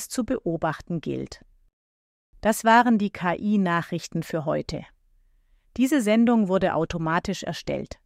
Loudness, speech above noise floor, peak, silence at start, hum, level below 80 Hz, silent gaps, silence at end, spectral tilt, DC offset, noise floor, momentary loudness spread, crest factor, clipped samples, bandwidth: -24 LUFS; 37 dB; -6 dBFS; 0 s; none; -52 dBFS; 1.73-2.33 s; 0.2 s; -5.5 dB/octave; under 0.1%; -61 dBFS; 13 LU; 20 dB; under 0.1%; 15.5 kHz